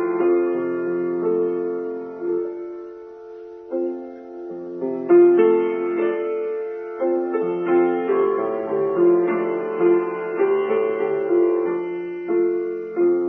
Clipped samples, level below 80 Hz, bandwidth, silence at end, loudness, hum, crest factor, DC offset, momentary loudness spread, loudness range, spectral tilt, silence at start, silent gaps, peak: under 0.1%; -70 dBFS; 3.4 kHz; 0 s; -21 LUFS; none; 16 dB; under 0.1%; 15 LU; 7 LU; -10 dB/octave; 0 s; none; -6 dBFS